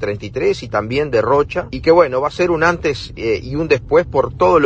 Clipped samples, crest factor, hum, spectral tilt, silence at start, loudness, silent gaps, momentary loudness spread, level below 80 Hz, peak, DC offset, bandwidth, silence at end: under 0.1%; 16 dB; none; -6 dB/octave; 0 s; -16 LUFS; none; 8 LU; -38 dBFS; 0 dBFS; under 0.1%; 8.4 kHz; 0 s